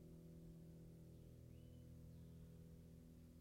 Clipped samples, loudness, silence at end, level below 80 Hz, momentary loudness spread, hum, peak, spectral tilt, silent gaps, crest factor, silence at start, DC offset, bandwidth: under 0.1%; -62 LUFS; 0 s; -68 dBFS; 2 LU; none; -50 dBFS; -7.5 dB/octave; none; 10 dB; 0 s; under 0.1%; 16 kHz